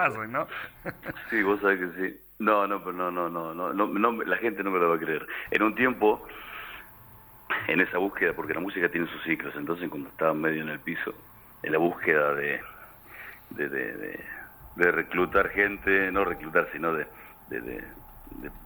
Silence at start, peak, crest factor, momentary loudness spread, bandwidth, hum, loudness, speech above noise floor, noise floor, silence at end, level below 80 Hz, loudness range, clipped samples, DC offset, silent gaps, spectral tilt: 0 s; -8 dBFS; 22 dB; 17 LU; over 20 kHz; none; -27 LUFS; 23 dB; -51 dBFS; 0 s; -56 dBFS; 3 LU; under 0.1%; under 0.1%; none; -6.5 dB/octave